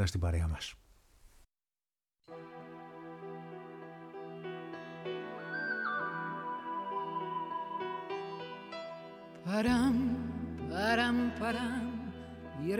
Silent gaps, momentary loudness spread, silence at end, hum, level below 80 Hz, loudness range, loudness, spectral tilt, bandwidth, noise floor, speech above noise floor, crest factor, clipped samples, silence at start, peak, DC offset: none; 18 LU; 0 s; none; -52 dBFS; 15 LU; -36 LUFS; -6 dB/octave; 15.5 kHz; under -90 dBFS; over 58 dB; 20 dB; under 0.1%; 0 s; -16 dBFS; under 0.1%